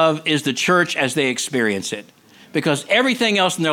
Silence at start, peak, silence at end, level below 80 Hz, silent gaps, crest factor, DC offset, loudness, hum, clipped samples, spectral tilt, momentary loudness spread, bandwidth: 0 s; -2 dBFS; 0 s; -66 dBFS; none; 16 dB; under 0.1%; -18 LUFS; none; under 0.1%; -3.5 dB/octave; 8 LU; 17.5 kHz